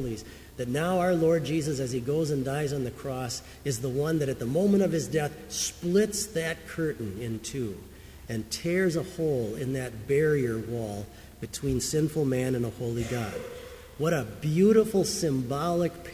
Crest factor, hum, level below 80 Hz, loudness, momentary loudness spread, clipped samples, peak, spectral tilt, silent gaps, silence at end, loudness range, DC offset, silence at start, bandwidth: 18 dB; none; -50 dBFS; -28 LUFS; 12 LU; under 0.1%; -10 dBFS; -5.5 dB/octave; none; 0 s; 4 LU; under 0.1%; 0 s; 16 kHz